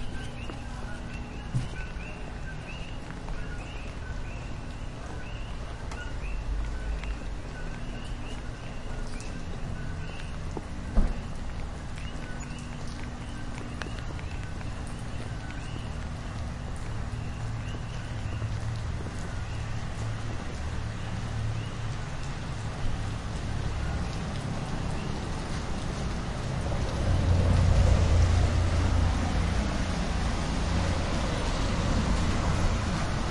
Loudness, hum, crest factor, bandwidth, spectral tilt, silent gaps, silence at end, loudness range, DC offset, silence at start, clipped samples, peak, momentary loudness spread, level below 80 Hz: -33 LUFS; none; 20 dB; 11.5 kHz; -6 dB/octave; none; 0 s; 12 LU; under 0.1%; 0 s; under 0.1%; -10 dBFS; 12 LU; -34 dBFS